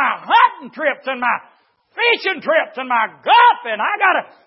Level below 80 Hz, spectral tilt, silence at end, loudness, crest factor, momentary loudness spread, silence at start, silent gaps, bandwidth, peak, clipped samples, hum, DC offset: -80 dBFS; -6 dB/octave; 0.25 s; -16 LUFS; 16 dB; 9 LU; 0 s; none; 5.8 kHz; 0 dBFS; under 0.1%; none; under 0.1%